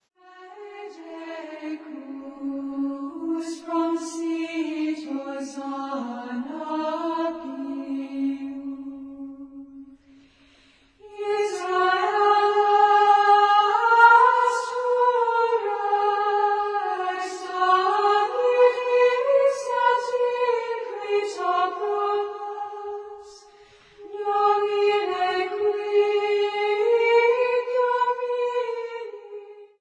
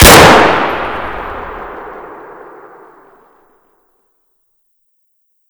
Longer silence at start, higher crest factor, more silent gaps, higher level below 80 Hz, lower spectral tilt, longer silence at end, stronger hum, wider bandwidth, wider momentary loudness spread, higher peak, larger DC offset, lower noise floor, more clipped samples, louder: first, 0.35 s vs 0 s; first, 20 dB vs 12 dB; neither; second, -70 dBFS vs -26 dBFS; about the same, -2.5 dB/octave vs -3 dB/octave; second, 0.15 s vs 3.35 s; neither; second, 10.5 kHz vs over 20 kHz; second, 18 LU vs 29 LU; about the same, -2 dBFS vs 0 dBFS; neither; second, -57 dBFS vs -61 dBFS; second, under 0.1% vs 4%; second, -22 LUFS vs -8 LUFS